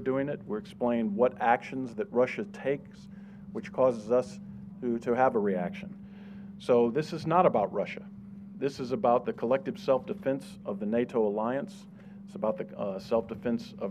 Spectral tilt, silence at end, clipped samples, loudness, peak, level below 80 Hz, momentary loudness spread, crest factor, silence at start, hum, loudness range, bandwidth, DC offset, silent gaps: -7.5 dB/octave; 0 s; under 0.1%; -30 LUFS; -10 dBFS; -66 dBFS; 19 LU; 20 dB; 0 s; none; 3 LU; 10.5 kHz; under 0.1%; none